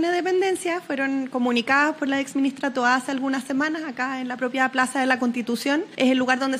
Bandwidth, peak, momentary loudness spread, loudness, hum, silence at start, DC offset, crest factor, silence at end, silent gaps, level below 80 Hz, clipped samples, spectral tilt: 15 kHz; -4 dBFS; 6 LU; -23 LUFS; none; 0 s; under 0.1%; 18 dB; 0 s; none; -76 dBFS; under 0.1%; -3 dB/octave